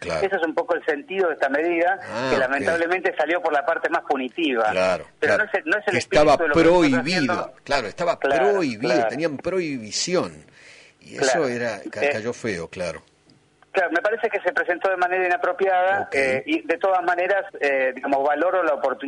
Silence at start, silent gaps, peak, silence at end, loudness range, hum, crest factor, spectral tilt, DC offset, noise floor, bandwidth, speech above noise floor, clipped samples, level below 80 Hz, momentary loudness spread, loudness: 0 s; none; -8 dBFS; 0 s; 6 LU; 50 Hz at -60 dBFS; 14 dB; -4 dB/octave; under 0.1%; -57 dBFS; 11 kHz; 36 dB; under 0.1%; -52 dBFS; 7 LU; -22 LUFS